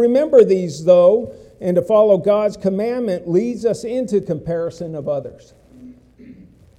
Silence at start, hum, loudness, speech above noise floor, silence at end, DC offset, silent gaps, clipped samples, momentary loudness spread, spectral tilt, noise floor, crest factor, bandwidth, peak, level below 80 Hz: 0 s; none; -17 LUFS; 27 dB; 0.45 s; under 0.1%; none; under 0.1%; 13 LU; -7.5 dB/octave; -44 dBFS; 16 dB; 11 kHz; 0 dBFS; -54 dBFS